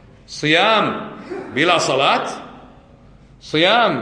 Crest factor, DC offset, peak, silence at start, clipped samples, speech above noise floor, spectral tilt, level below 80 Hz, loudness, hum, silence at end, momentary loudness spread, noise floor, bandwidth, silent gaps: 18 dB; under 0.1%; -2 dBFS; 0.3 s; under 0.1%; 29 dB; -3.5 dB/octave; -54 dBFS; -16 LUFS; none; 0 s; 17 LU; -46 dBFS; 10.5 kHz; none